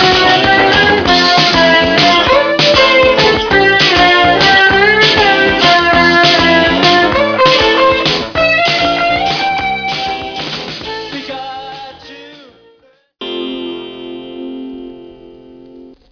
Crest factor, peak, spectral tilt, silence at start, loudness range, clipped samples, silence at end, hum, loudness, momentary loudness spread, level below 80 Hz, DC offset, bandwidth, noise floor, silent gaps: 12 dB; 0 dBFS; -4 dB/octave; 0 s; 18 LU; under 0.1%; 0.25 s; none; -8 LUFS; 18 LU; -36 dBFS; under 0.1%; 5.4 kHz; -51 dBFS; none